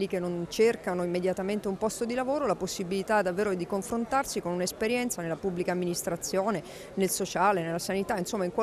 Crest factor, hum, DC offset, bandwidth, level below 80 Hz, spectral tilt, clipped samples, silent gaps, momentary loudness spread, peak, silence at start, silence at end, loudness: 16 dB; none; under 0.1%; 14.5 kHz; -58 dBFS; -4.5 dB/octave; under 0.1%; none; 6 LU; -12 dBFS; 0 s; 0 s; -29 LUFS